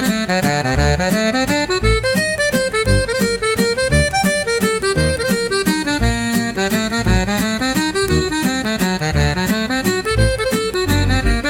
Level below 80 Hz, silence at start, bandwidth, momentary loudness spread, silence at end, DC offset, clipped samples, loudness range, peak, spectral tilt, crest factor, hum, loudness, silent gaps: -26 dBFS; 0 s; 17.5 kHz; 2 LU; 0 s; under 0.1%; under 0.1%; 1 LU; -2 dBFS; -4.5 dB/octave; 14 dB; none; -17 LUFS; none